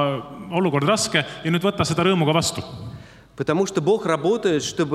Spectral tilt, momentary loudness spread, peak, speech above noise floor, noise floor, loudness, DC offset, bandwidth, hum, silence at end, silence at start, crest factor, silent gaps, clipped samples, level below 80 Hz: -4.5 dB/octave; 11 LU; -4 dBFS; 21 dB; -41 dBFS; -21 LUFS; under 0.1%; 14.5 kHz; none; 0 s; 0 s; 18 dB; none; under 0.1%; -54 dBFS